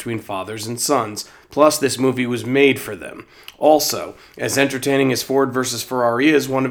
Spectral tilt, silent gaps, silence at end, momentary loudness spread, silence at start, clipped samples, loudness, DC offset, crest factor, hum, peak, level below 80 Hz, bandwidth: -4 dB/octave; none; 0 s; 12 LU; 0 s; under 0.1%; -18 LUFS; under 0.1%; 18 dB; none; 0 dBFS; -60 dBFS; over 20 kHz